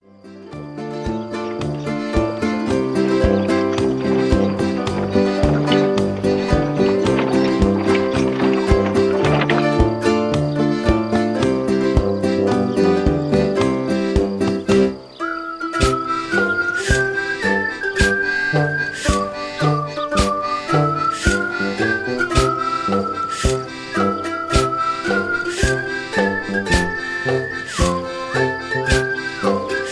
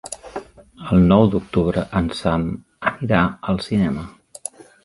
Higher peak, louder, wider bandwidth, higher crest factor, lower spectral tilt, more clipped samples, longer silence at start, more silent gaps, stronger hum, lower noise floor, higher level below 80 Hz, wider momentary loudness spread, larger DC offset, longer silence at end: about the same, -2 dBFS vs 0 dBFS; about the same, -19 LUFS vs -19 LUFS; about the same, 11 kHz vs 11.5 kHz; about the same, 16 dB vs 20 dB; about the same, -5.5 dB/octave vs -6.5 dB/octave; neither; first, 0.25 s vs 0.05 s; neither; neither; about the same, -40 dBFS vs -38 dBFS; first, -30 dBFS vs -38 dBFS; second, 6 LU vs 19 LU; neither; second, 0 s vs 0.75 s